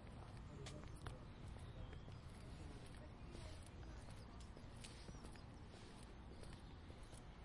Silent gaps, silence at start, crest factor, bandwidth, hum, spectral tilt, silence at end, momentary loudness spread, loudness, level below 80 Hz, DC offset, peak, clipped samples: none; 0 s; 22 dB; 11.5 kHz; none; -5.5 dB/octave; 0 s; 4 LU; -57 LUFS; -60 dBFS; under 0.1%; -32 dBFS; under 0.1%